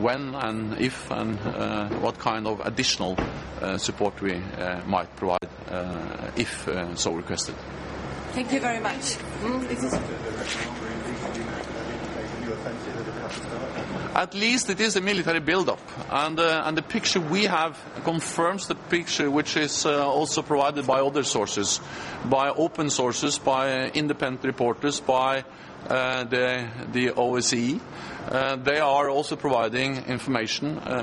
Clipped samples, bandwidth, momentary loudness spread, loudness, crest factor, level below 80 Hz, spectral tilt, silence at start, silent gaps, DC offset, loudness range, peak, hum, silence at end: under 0.1%; 11.5 kHz; 10 LU; -26 LUFS; 22 dB; -50 dBFS; -3.5 dB/octave; 0 s; none; under 0.1%; 6 LU; -4 dBFS; none; 0 s